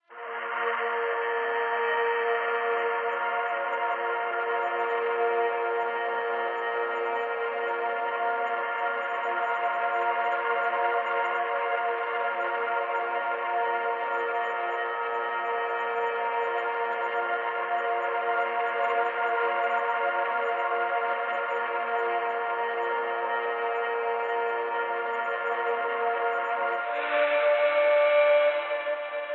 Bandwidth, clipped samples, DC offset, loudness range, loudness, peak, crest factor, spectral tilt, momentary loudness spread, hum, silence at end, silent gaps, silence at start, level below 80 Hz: 7.2 kHz; under 0.1%; under 0.1%; 3 LU; -27 LUFS; -12 dBFS; 16 dB; -3 dB/octave; 3 LU; none; 0 s; none; 0.1 s; under -90 dBFS